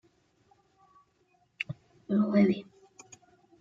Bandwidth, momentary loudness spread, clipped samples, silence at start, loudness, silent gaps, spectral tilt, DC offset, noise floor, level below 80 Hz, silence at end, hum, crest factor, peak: 7.4 kHz; 25 LU; under 0.1%; 1.6 s; -29 LUFS; none; -7.5 dB/octave; under 0.1%; -70 dBFS; -74 dBFS; 0.95 s; none; 20 dB; -14 dBFS